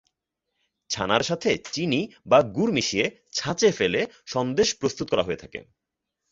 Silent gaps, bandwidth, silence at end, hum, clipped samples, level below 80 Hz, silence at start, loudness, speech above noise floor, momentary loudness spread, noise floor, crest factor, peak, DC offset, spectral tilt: none; 7.8 kHz; 0.7 s; none; under 0.1%; -56 dBFS; 0.9 s; -24 LUFS; 59 dB; 9 LU; -84 dBFS; 22 dB; -4 dBFS; under 0.1%; -4 dB/octave